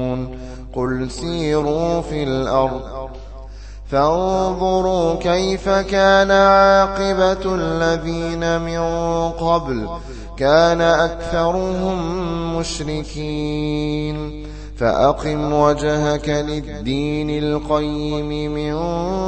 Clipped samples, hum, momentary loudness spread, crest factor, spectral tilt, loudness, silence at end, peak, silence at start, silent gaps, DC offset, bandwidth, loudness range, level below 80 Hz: under 0.1%; none; 13 LU; 18 dB; -5.5 dB/octave; -18 LUFS; 0 s; 0 dBFS; 0 s; none; under 0.1%; 8.8 kHz; 6 LU; -32 dBFS